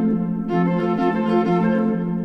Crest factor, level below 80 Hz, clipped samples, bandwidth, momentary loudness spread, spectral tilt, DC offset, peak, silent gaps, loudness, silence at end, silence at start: 12 dB; -50 dBFS; under 0.1%; 6 kHz; 3 LU; -9.5 dB/octave; under 0.1%; -8 dBFS; none; -20 LUFS; 0 s; 0 s